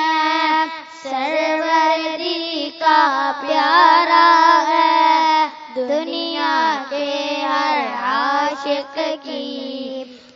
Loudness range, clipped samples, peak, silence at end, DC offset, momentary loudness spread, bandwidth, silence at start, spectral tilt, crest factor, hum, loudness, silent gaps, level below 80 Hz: 6 LU; under 0.1%; 0 dBFS; 0.2 s; under 0.1%; 14 LU; 7.6 kHz; 0 s; -1.5 dB/octave; 18 dB; none; -17 LUFS; none; -72 dBFS